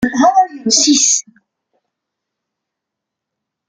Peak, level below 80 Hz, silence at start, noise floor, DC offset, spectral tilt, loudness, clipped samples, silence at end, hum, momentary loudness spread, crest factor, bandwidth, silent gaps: 0 dBFS; -56 dBFS; 0 s; -80 dBFS; under 0.1%; -1 dB/octave; -11 LUFS; under 0.1%; 2.45 s; none; 5 LU; 16 dB; 10.5 kHz; none